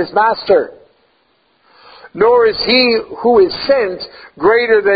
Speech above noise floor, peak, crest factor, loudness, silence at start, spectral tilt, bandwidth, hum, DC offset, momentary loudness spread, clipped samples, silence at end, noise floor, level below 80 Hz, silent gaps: 45 dB; 0 dBFS; 14 dB; -12 LUFS; 0 s; -9 dB/octave; 5 kHz; none; under 0.1%; 14 LU; under 0.1%; 0 s; -58 dBFS; -50 dBFS; none